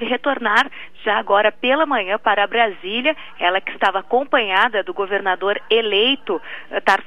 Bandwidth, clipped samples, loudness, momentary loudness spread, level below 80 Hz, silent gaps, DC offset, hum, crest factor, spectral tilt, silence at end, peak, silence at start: 12.5 kHz; under 0.1%; -18 LUFS; 6 LU; -62 dBFS; none; 1%; none; 18 dB; -3.5 dB/octave; 0.05 s; 0 dBFS; 0 s